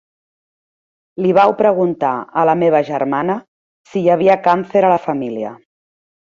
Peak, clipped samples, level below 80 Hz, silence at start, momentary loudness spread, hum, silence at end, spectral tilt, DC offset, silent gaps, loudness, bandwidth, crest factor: -2 dBFS; under 0.1%; -62 dBFS; 1.2 s; 12 LU; none; 0.8 s; -8 dB/octave; under 0.1%; 3.48-3.84 s; -15 LUFS; 7.4 kHz; 16 dB